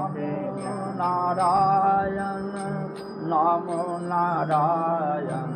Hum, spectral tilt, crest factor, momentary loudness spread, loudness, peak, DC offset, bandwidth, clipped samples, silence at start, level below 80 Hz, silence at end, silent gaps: none; -7 dB/octave; 14 dB; 10 LU; -25 LUFS; -10 dBFS; under 0.1%; 11.5 kHz; under 0.1%; 0 s; -58 dBFS; 0 s; none